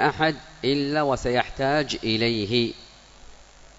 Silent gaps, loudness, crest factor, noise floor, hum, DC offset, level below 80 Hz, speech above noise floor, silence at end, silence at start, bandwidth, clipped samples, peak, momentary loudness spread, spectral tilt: none; -24 LUFS; 20 dB; -48 dBFS; none; under 0.1%; -46 dBFS; 24 dB; 0.35 s; 0 s; 8 kHz; under 0.1%; -6 dBFS; 4 LU; -5 dB/octave